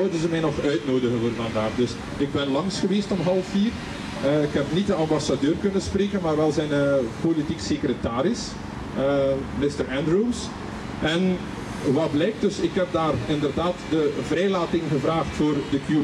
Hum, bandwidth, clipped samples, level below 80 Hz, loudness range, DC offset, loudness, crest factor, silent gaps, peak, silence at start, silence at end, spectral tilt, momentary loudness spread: none; 12 kHz; under 0.1%; -44 dBFS; 2 LU; under 0.1%; -24 LUFS; 12 dB; none; -10 dBFS; 0 s; 0 s; -6 dB/octave; 5 LU